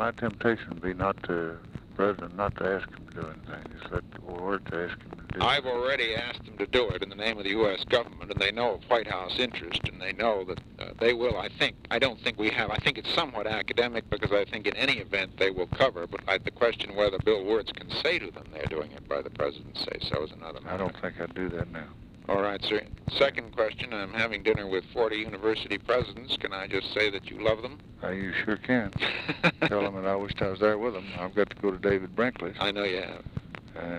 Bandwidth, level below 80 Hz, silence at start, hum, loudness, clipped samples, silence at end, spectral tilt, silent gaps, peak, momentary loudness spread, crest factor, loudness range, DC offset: 11.5 kHz; -50 dBFS; 0 s; none; -29 LUFS; under 0.1%; 0 s; -5.5 dB/octave; none; -8 dBFS; 11 LU; 22 dB; 5 LU; under 0.1%